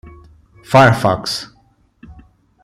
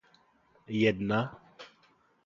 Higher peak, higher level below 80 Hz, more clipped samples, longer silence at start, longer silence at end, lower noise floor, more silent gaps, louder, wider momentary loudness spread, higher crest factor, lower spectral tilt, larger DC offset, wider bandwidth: first, 0 dBFS vs -12 dBFS; first, -46 dBFS vs -64 dBFS; neither; about the same, 0.7 s vs 0.7 s; about the same, 0.5 s vs 0.6 s; second, -49 dBFS vs -67 dBFS; neither; first, -14 LUFS vs -30 LUFS; second, 14 LU vs 24 LU; about the same, 18 dB vs 20 dB; second, -5.5 dB/octave vs -7 dB/octave; neither; first, 14.5 kHz vs 7.4 kHz